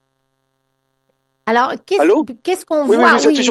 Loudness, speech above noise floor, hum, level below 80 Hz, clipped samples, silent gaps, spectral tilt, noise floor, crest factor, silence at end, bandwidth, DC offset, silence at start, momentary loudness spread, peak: -14 LUFS; 55 dB; none; -64 dBFS; under 0.1%; none; -3 dB/octave; -68 dBFS; 16 dB; 0 s; 12.5 kHz; under 0.1%; 1.45 s; 10 LU; 0 dBFS